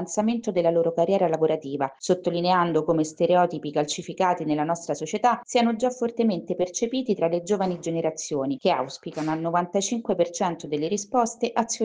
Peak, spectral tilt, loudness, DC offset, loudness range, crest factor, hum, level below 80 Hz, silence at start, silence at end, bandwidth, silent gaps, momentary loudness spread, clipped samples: -8 dBFS; -5 dB/octave; -25 LUFS; under 0.1%; 3 LU; 16 dB; none; -66 dBFS; 0 s; 0 s; 10 kHz; none; 6 LU; under 0.1%